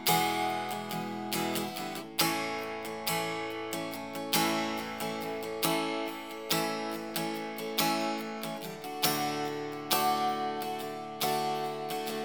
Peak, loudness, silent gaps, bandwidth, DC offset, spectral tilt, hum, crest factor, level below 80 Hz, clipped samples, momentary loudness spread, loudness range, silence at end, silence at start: -10 dBFS; -32 LUFS; none; over 20 kHz; 0.1%; -3 dB/octave; none; 24 dB; -76 dBFS; under 0.1%; 9 LU; 2 LU; 0 s; 0 s